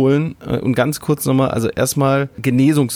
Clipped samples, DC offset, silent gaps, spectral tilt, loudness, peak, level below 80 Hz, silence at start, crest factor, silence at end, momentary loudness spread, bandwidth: under 0.1%; under 0.1%; none; -6 dB/octave; -17 LUFS; -2 dBFS; -46 dBFS; 0 s; 14 dB; 0 s; 5 LU; 19 kHz